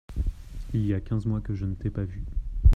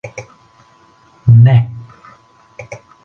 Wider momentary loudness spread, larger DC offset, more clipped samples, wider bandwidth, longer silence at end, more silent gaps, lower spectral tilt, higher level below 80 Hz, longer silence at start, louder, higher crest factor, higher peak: second, 8 LU vs 25 LU; neither; neither; second, 5.6 kHz vs 6.6 kHz; second, 0 s vs 0.3 s; neither; about the same, -9.5 dB/octave vs -8.5 dB/octave; first, -28 dBFS vs -44 dBFS; about the same, 0.1 s vs 0.05 s; second, -30 LUFS vs -10 LUFS; about the same, 18 dB vs 14 dB; second, -6 dBFS vs 0 dBFS